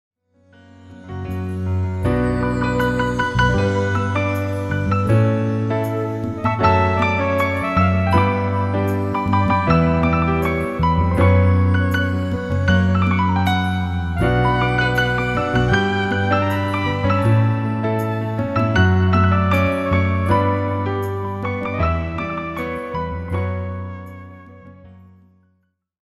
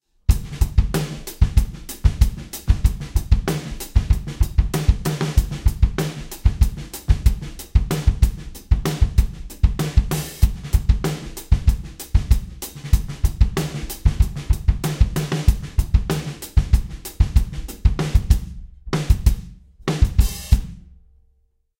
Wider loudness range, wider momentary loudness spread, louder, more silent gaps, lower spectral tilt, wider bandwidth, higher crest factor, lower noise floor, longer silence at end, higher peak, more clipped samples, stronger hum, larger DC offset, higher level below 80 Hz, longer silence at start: first, 6 LU vs 1 LU; about the same, 9 LU vs 7 LU; first, -19 LUFS vs -22 LUFS; neither; first, -7.5 dB/octave vs -6 dB/octave; second, 12.5 kHz vs 17 kHz; about the same, 16 dB vs 18 dB; about the same, -66 dBFS vs -63 dBFS; first, 1.2 s vs 1 s; about the same, -2 dBFS vs 0 dBFS; neither; neither; neither; second, -34 dBFS vs -20 dBFS; first, 0.8 s vs 0.3 s